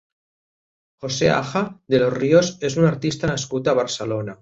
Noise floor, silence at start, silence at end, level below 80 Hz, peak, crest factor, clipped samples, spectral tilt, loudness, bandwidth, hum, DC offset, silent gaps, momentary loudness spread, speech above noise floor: under -90 dBFS; 1 s; 0.1 s; -52 dBFS; -2 dBFS; 18 dB; under 0.1%; -5.5 dB/octave; -20 LUFS; 8 kHz; none; under 0.1%; none; 8 LU; over 70 dB